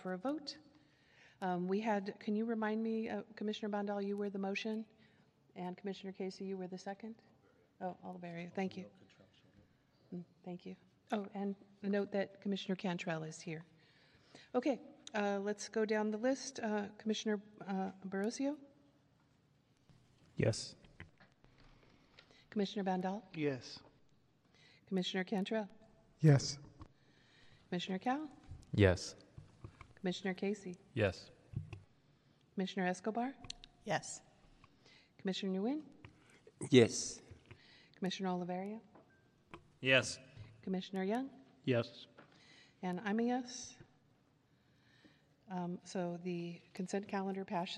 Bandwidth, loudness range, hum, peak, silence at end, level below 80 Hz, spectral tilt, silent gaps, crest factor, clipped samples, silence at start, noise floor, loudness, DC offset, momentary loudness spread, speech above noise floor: 11.5 kHz; 9 LU; none; -12 dBFS; 0 s; -70 dBFS; -5.5 dB/octave; none; 28 dB; under 0.1%; 0 s; -73 dBFS; -39 LUFS; under 0.1%; 17 LU; 34 dB